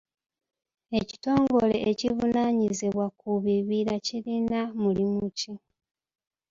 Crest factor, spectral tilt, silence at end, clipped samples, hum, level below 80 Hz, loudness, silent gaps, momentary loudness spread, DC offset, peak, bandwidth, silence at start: 20 dB; -6 dB/octave; 0.95 s; under 0.1%; none; -58 dBFS; -27 LUFS; none; 8 LU; under 0.1%; -8 dBFS; 7.8 kHz; 0.9 s